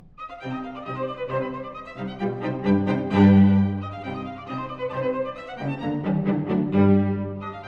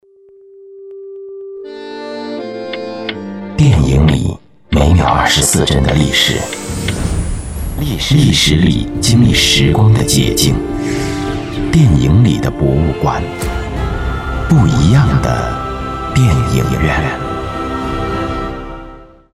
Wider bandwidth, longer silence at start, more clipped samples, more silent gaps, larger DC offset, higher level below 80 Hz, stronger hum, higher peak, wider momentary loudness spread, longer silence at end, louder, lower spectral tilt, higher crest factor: second, 5 kHz vs 15 kHz; second, 0.05 s vs 0.55 s; neither; neither; neither; second, -54 dBFS vs -24 dBFS; neither; second, -4 dBFS vs 0 dBFS; about the same, 15 LU vs 15 LU; second, 0 s vs 0.25 s; second, -23 LUFS vs -13 LUFS; first, -9.5 dB/octave vs -5 dB/octave; about the same, 18 dB vs 14 dB